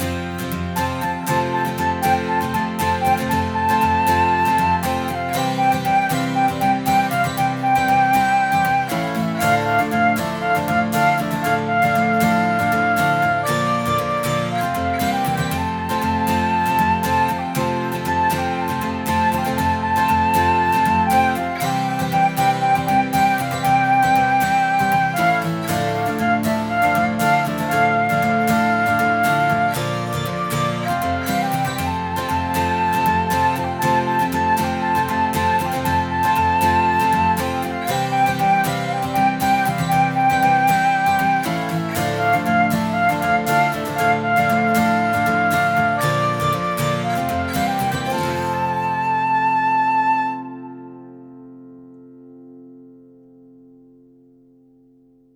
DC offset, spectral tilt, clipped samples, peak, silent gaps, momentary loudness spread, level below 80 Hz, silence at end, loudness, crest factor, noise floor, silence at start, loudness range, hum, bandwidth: under 0.1%; -5 dB/octave; under 0.1%; -4 dBFS; none; 5 LU; -46 dBFS; 2.45 s; -19 LUFS; 14 dB; -53 dBFS; 0 s; 3 LU; none; over 20 kHz